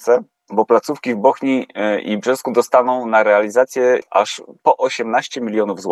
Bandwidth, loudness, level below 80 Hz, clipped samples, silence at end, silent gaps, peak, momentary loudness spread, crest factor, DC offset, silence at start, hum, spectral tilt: 13 kHz; -17 LUFS; -76 dBFS; under 0.1%; 0 s; none; 0 dBFS; 6 LU; 16 dB; under 0.1%; 0 s; none; -4.5 dB/octave